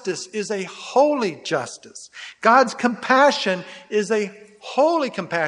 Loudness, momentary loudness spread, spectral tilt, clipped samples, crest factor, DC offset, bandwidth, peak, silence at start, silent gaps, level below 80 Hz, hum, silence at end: -20 LUFS; 18 LU; -4 dB/octave; under 0.1%; 20 dB; under 0.1%; 11 kHz; 0 dBFS; 0.05 s; none; -76 dBFS; none; 0 s